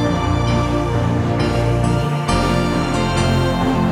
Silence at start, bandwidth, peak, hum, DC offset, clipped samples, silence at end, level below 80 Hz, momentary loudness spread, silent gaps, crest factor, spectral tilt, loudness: 0 s; 13.5 kHz; -4 dBFS; none; under 0.1%; under 0.1%; 0 s; -28 dBFS; 2 LU; none; 12 dB; -6.5 dB/octave; -18 LUFS